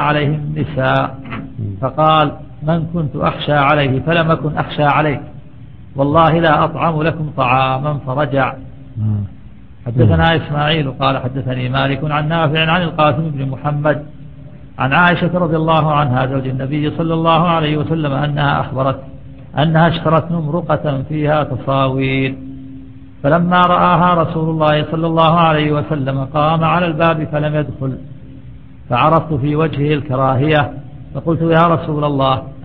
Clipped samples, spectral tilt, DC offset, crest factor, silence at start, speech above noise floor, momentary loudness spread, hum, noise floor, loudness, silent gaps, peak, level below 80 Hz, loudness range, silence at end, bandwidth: under 0.1%; -10 dB/octave; 1%; 16 dB; 0 s; 23 dB; 11 LU; none; -38 dBFS; -15 LUFS; none; 0 dBFS; -38 dBFS; 3 LU; 0 s; 4.5 kHz